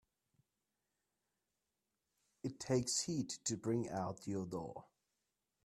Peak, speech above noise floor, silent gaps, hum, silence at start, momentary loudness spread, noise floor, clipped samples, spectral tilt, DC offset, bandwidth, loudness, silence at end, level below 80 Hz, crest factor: -22 dBFS; 49 dB; none; none; 2.45 s; 12 LU; -89 dBFS; under 0.1%; -4.5 dB/octave; under 0.1%; 13.5 kHz; -40 LUFS; 0.8 s; -74 dBFS; 22 dB